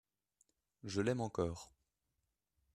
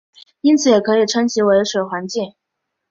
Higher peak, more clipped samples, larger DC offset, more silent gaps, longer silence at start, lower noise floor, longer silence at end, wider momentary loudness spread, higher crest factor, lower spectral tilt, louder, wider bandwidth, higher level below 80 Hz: second, -22 dBFS vs -2 dBFS; neither; neither; neither; first, 0.85 s vs 0.45 s; first, -87 dBFS vs -77 dBFS; first, 1.1 s vs 0.6 s; first, 17 LU vs 11 LU; first, 22 dB vs 16 dB; first, -6 dB/octave vs -4 dB/octave; second, -39 LUFS vs -16 LUFS; first, 13.5 kHz vs 8 kHz; second, -68 dBFS vs -62 dBFS